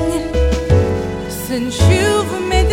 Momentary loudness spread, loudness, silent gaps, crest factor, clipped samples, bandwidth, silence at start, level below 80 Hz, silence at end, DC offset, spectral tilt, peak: 9 LU; -16 LUFS; none; 14 dB; under 0.1%; 16.5 kHz; 0 s; -22 dBFS; 0 s; 0.5%; -5.5 dB/octave; 0 dBFS